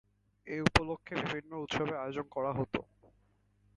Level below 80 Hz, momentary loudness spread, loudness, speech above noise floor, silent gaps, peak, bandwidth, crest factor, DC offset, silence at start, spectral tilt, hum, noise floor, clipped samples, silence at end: -50 dBFS; 11 LU; -35 LUFS; 36 dB; none; -6 dBFS; 11 kHz; 30 dB; under 0.1%; 0.45 s; -5.5 dB/octave; none; -71 dBFS; under 0.1%; 0.95 s